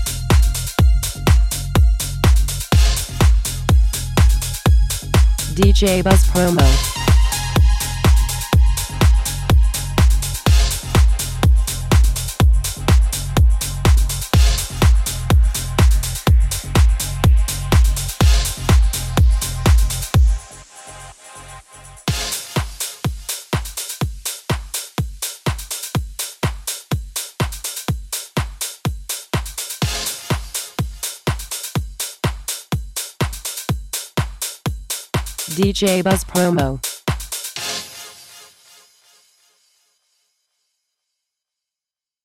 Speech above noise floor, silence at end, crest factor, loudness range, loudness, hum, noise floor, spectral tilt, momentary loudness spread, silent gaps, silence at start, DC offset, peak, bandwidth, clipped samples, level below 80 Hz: 75 dB; 4.1 s; 16 dB; 9 LU; -18 LUFS; none; -89 dBFS; -4.5 dB/octave; 10 LU; none; 0 s; under 0.1%; 0 dBFS; 16.5 kHz; under 0.1%; -18 dBFS